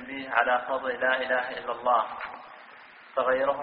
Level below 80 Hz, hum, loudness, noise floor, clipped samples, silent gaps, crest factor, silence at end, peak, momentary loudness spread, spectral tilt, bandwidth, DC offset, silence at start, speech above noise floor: -66 dBFS; none; -27 LUFS; -50 dBFS; under 0.1%; none; 22 dB; 0 s; -6 dBFS; 19 LU; 0 dB/octave; 5.2 kHz; under 0.1%; 0 s; 23 dB